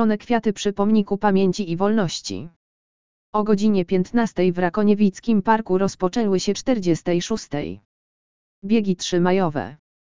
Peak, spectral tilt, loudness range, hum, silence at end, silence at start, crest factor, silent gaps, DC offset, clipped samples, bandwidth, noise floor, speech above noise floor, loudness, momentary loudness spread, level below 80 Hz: -2 dBFS; -6 dB/octave; 3 LU; none; 0.2 s; 0 s; 18 dB; 2.56-3.33 s, 7.85-8.62 s; 2%; under 0.1%; 7.6 kHz; under -90 dBFS; over 70 dB; -21 LUFS; 10 LU; -52 dBFS